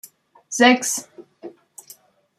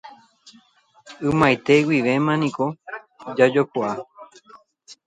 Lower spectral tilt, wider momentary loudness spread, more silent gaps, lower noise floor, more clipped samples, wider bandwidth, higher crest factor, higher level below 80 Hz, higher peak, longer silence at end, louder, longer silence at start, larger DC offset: second, -1.5 dB/octave vs -6.5 dB/octave; first, 26 LU vs 18 LU; neither; second, -50 dBFS vs -57 dBFS; neither; first, 15 kHz vs 10.5 kHz; about the same, 22 dB vs 20 dB; second, -72 dBFS vs -56 dBFS; about the same, -2 dBFS vs -2 dBFS; first, 0.9 s vs 0.15 s; about the same, -18 LUFS vs -20 LUFS; first, 0.5 s vs 0.05 s; neither